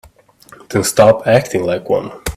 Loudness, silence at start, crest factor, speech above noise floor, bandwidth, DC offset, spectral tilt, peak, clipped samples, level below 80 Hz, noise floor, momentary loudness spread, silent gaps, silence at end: -14 LUFS; 0.7 s; 16 dB; 31 dB; 16 kHz; under 0.1%; -5 dB/octave; 0 dBFS; under 0.1%; -40 dBFS; -45 dBFS; 9 LU; none; 0 s